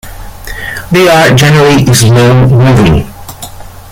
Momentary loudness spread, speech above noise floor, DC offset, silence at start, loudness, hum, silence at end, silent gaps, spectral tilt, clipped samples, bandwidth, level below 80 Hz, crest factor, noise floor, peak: 20 LU; 21 dB; under 0.1%; 0.05 s; -5 LUFS; none; 0 s; none; -5.5 dB/octave; 0.2%; 17 kHz; -26 dBFS; 6 dB; -25 dBFS; 0 dBFS